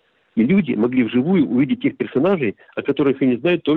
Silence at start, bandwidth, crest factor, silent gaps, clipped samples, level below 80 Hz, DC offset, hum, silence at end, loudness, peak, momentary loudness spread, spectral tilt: 0.35 s; 4.2 kHz; 10 dB; none; under 0.1%; -58 dBFS; under 0.1%; none; 0 s; -19 LUFS; -8 dBFS; 6 LU; -10 dB/octave